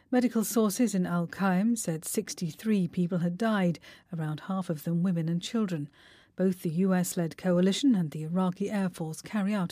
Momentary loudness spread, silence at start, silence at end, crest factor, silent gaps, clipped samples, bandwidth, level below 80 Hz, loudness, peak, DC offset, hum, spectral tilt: 8 LU; 0.1 s; 0 s; 14 dB; none; under 0.1%; 15.5 kHz; -72 dBFS; -29 LUFS; -16 dBFS; under 0.1%; none; -6 dB/octave